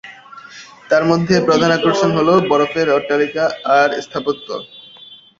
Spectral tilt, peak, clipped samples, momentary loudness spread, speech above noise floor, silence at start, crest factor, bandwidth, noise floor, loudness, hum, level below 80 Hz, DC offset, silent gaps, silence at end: -5.5 dB/octave; -2 dBFS; under 0.1%; 19 LU; 27 dB; 0.05 s; 16 dB; 7.6 kHz; -42 dBFS; -15 LUFS; none; -54 dBFS; under 0.1%; none; 0.25 s